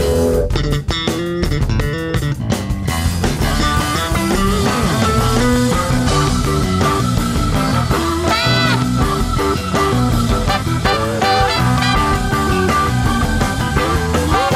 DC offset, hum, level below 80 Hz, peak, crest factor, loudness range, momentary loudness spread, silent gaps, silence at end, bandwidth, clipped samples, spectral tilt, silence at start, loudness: under 0.1%; none; -24 dBFS; -2 dBFS; 14 dB; 3 LU; 4 LU; none; 0 s; 16 kHz; under 0.1%; -5 dB/octave; 0 s; -16 LUFS